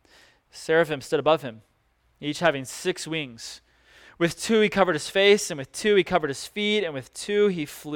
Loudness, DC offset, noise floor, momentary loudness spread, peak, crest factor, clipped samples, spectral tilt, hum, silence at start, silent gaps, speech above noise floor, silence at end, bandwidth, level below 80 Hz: -24 LUFS; under 0.1%; -66 dBFS; 14 LU; -6 dBFS; 20 dB; under 0.1%; -4 dB/octave; none; 0.55 s; none; 42 dB; 0 s; 17.5 kHz; -60 dBFS